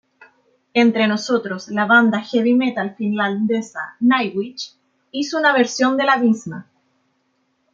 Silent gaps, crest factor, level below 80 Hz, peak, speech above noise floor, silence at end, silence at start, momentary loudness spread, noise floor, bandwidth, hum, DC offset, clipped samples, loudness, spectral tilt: none; 16 dB; -70 dBFS; -2 dBFS; 49 dB; 1.1 s; 0.75 s; 14 LU; -67 dBFS; 7.6 kHz; none; under 0.1%; under 0.1%; -18 LUFS; -4.5 dB/octave